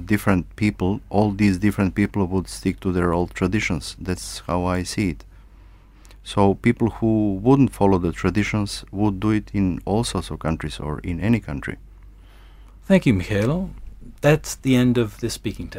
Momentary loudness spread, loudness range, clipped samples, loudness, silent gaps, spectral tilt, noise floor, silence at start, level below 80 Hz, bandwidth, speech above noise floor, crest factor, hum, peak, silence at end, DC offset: 10 LU; 5 LU; under 0.1%; -22 LUFS; none; -6.5 dB/octave; -47 dBFS; 0 s; -38 dBFS; 16 kHz; 26 dB; 18 dB; none; -2 dBFS; 0 s; under 0.1%